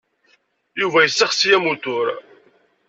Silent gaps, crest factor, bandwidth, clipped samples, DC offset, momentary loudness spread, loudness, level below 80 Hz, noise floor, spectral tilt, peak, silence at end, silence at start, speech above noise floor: none; 18 dB; 8 kHz; under 0.1%; under 0.1%; 12 LU; -17 LUFS; -68 dBFS; -61 dBFS; -2 dB/octave; -2 dBFS; 0.7 s; 0.75 s; 43 dB